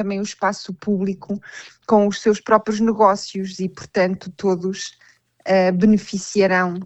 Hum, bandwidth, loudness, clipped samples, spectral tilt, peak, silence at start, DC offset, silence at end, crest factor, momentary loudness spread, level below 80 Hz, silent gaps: none; 8.4 kHz; -20 LUFS; under 0.1%; -5.5 dB/octave; 0 dBFS; 0 s; under 0.1%; 0 s; 18 dB; 14 LU; -58 dBFS; none